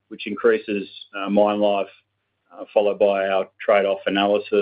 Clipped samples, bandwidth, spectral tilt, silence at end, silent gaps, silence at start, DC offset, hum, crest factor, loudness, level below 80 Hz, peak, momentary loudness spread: under 0.1%; 5 kHz; -9.5 dB/octave; 0 s; none; 0.1 s; under 0.1%; none; 16 dB; -21 LUFS; -68 dBFS; -4 dBFS; 12 LU